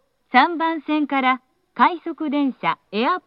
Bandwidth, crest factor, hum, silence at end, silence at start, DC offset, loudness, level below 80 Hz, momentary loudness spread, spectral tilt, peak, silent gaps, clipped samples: 5.6 kHz; 20 dB; none; 0.1 s; 0.35 s; under 0.1%; -21 LUFS; -78 dBFS; 8 LU; -6.5 dB/octave; 0 dBFS; none; under 0.1%